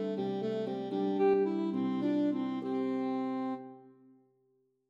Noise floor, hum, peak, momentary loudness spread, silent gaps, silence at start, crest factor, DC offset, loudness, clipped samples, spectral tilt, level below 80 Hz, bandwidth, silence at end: -74 dBFS; none; -18 dBFS; 8 LU; none; 0 s; 14 dB; under 0.1%; -33 LUFS; under 0.1%; -8.5 dB/octave; -84 dBFS; 7.2 kHz; 1 s